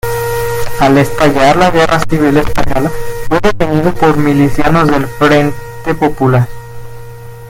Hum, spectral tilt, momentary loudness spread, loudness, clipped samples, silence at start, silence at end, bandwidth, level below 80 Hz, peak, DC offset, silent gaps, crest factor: none; -6 dB/octave; 13 LU; -11 LUFS; 0.8%; 0.05 s; 0 s; 17 kHz; -26 dBFS; 0 dBFS; under 0.1%; none; 10 dB